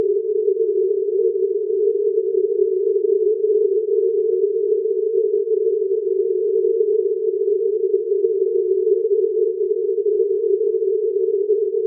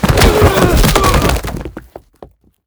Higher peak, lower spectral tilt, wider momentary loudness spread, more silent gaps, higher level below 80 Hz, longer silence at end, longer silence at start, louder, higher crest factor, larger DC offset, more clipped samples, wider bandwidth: second, -6 dBFS vs 0 dBFS; second, -2.5 dB/octave vs -5 dB/octave; second, 2 LU vs 16 LU; neither; second, under -90 dBFS vs -18 dBFS; second, 0 s vs 0.4 s; about the same, 0 s vs 0 s; second, -19 LUFS vs -11 LUFS; about the same, 12 dB vs 12 dB; neither; second, under 0.1% vs 0.3%; second, 0.5 kHz vs over 20 kHz